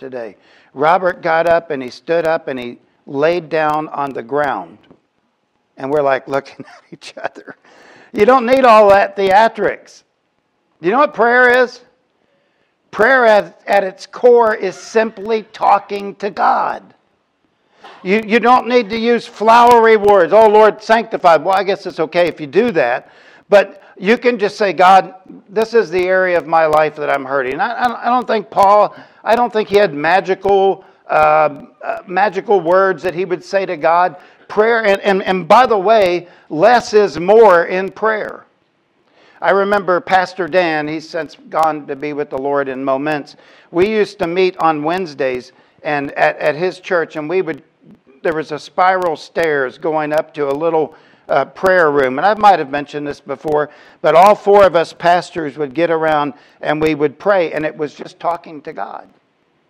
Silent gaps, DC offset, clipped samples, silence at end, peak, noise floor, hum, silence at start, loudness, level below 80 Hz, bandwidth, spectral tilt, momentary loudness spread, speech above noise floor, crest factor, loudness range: none; under 0.1%; under 0.1%; 0.7 s; 0 dBFS; -65 dBFS; none; 0 s; -14 LUFS; -56 dBFS; 15.5 kHz; -5.5 dB/octave; 15 LU; 51 dB; 14 dB; 7 LU